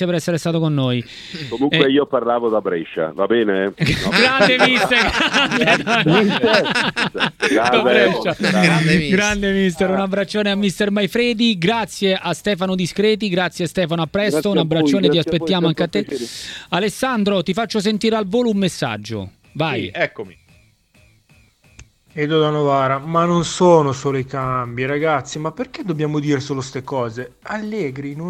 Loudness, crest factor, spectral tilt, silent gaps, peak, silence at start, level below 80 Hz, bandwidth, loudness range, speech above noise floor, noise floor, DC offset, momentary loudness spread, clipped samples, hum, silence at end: -17 LUFS; 18 dB; -5 dB/octave; none; 0 dBFS; 0 s; -46 dBFS; 15 kHz; 8 LU; 36 dB; -54 dBFS; under 0.1%; 11 LU; under 0.1%; none; 0 s